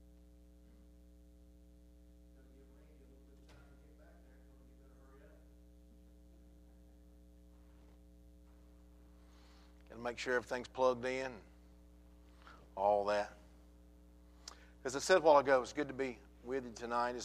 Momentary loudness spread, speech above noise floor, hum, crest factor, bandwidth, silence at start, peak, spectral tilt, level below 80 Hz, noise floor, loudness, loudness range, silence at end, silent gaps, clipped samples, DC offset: 25 LU; 26 dB; none; 26 dB; 15 kHz; 5.25 s; -16 dBFS; -4 dB/octave; -62 dBFS; -61 dBFS; -36 LUFS; 10 LU; 0 s; none; under 0.1%; under 0.1%